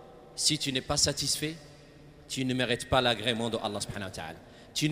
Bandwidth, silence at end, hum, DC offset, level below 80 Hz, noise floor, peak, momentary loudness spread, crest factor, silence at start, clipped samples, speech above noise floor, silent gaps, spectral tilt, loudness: 15.5 kHz; 0 s; none; under 0.1%; -52 dBFS; -52 dBFS; -10 dBFS; 15 LU; 22 dB; 0 s; under 0.1%; 22 dB; none; -3 dB/octave; -29 LUFS